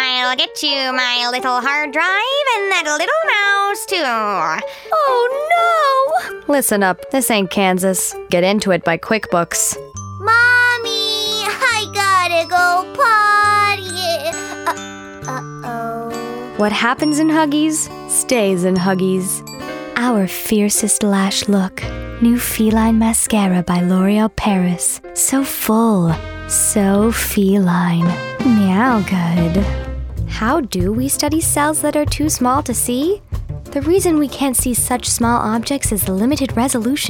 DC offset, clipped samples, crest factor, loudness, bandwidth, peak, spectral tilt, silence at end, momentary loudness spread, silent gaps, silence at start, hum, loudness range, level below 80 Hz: under 0.1%; under 0.1%; 16 dB; -15 LUFS; 19.5 kHz; 0 dBFS; -3.5 dB/octave; 0 s; 9 LU; none; 0 s; none; 3 LU; -36 dBFS